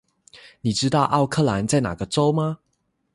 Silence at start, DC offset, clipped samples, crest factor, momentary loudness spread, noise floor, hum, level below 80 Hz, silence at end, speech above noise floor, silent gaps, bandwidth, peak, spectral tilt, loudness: 0.35 s; under 0.1%; under 0.1%; 18 dB; 8 LU; -71 dBFS; none; -50 dBFS; 0.6 s; 51 dB; none; 11.5 kHz; -4 dBFS; -5.5 dB/octave; -22 LUFS